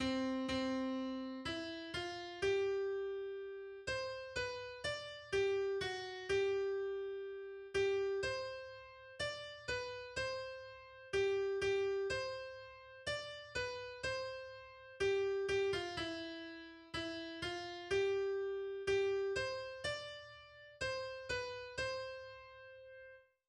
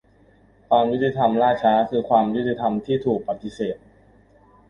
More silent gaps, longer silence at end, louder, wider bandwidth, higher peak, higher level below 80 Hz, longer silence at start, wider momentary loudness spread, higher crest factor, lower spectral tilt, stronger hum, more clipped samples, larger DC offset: neither; second, 0.3 s vs 0.95 s; second, -40 LUFS vs -21 LUFS; first, 11 kHz vs 8.6 kHz; second, -26 dBFS vs -6 dBFS; second, -64 dBFS vs -56 dBFS; second, 0 s vs 0.7 s; first, 16 LU vs 10 LU; about the same, 14 dB vs 18 dB; second, -4 dB/octave vs -8 dB/octave; neither; neither; neither